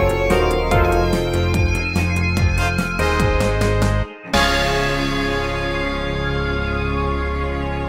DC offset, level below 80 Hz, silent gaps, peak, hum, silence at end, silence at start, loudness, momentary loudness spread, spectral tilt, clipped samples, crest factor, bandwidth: under 0.1%; -24 dBFS; none; -4 dBFS; none; 0 s; 0 s; -19 LUFS; 5 LU; -5.5 dB/octave; under 0.1%; 14 dB; 16 kHz